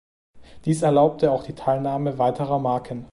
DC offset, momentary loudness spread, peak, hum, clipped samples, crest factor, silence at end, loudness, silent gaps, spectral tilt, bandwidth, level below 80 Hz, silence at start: under 0.1%; 8 LU; -6 dBFS; none; under 0.1%; 16 dB; 0.05 s; -22 LUFS; none; -7.5 dB/octave; 11.5 kHz; -54 dBFS; 0.35 s